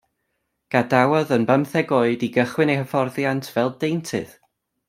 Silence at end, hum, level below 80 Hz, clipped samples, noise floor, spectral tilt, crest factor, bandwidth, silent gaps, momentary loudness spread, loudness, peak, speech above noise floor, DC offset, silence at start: 0.6 s; none; -64 dBFS; under 0.1%; -75 dBFS; -6.5 dB/octave; 20 dB; 16 kHz; none; 8 LU; -21 LUFS; 0 dBFS; 54 dB; under 0.1%; 0.7 s